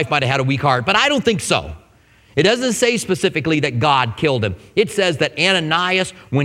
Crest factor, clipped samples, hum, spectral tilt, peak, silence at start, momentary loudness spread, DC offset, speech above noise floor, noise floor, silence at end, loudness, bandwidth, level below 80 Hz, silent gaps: 18 dB; under 0.1%; none; -4.5 dB/octave; 0 dBFS; 0 s; 5 LU; under 0.1%; 34 dB; -51 dBFS; 0 s; -17 LUFS; 15.5 kHz; -46 dBFS; none